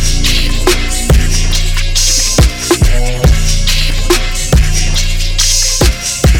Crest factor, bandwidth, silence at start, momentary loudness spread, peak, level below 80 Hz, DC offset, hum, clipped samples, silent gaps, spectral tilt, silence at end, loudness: 10 dB; 17.5 kHz; 0 s; 5 LU; 0 dBFS; -12 dBFS; under 0.1%; none; under 0.1%; none; -3 dB/octave; 0 s; -11 LUFS